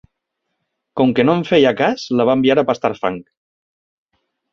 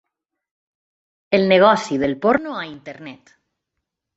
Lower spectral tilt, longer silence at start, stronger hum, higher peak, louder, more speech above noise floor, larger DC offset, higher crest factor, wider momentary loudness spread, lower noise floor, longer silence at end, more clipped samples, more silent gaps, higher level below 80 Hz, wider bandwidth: about the same, -6.5 dB/octave vs -5.5 dB/octave; second, 0.95 s vs 1.3 s; neither; about the same, -2 dBFS vs -2 dBFS; about the same, -16 LUFS vs -17 LUFS; about the same, 60 dB vs 62 dB; neither; about the same, 16 dB vs 20 dB; second, 10 LU vs 22 LU; second, -75 dBFS vs -80 dBFS; first, 1.3 s vs 1 s; neither; neither; about the same, -56 dBFS vs -58 dBFS; second, 7 kHz vs 8 kHz